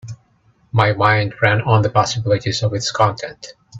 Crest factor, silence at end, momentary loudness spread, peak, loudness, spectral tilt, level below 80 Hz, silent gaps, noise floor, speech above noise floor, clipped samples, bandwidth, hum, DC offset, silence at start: 18 dB; 0 s; 15 LU; 0 dBFS; -17 LUFS; -5 dB/octave; -50 dBFS; none; -57 dBFS; 40 dB; under 0.1%; 7.8 kHz; none; under 0.1%; 0.05 s